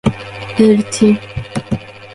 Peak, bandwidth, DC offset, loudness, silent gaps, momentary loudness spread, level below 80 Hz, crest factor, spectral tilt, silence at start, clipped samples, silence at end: 0 dBFS; 11.5 kHz; under 0.1%; -15 LUFS; none; 12 LU; -40 dBFS; 14 dB; -6 dB/octave; 0.05 s; under 0.1%; 0 s